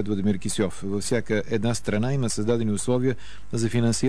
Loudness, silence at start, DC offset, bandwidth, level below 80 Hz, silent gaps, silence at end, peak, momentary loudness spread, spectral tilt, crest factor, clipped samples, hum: -25 LUFS; 0 s; 3%; 11 kHz; -48 dBFS; none; 0 s; -12 dBFS; 4 LU; -5.5 dB/octave; 14 dB; under 0.1%; none